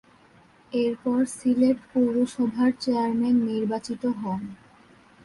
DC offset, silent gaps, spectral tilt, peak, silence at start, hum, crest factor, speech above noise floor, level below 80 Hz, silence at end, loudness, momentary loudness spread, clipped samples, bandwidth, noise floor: under 0.1%; none; -6 dB/octave; -12 dBFS; 0.7 s; none; 14 dB; 32 dB; -64 dBFS; 0.7 s; -25 LUFS; 8 LU; under 0.1%; 11.5 kHz; -56 dBFS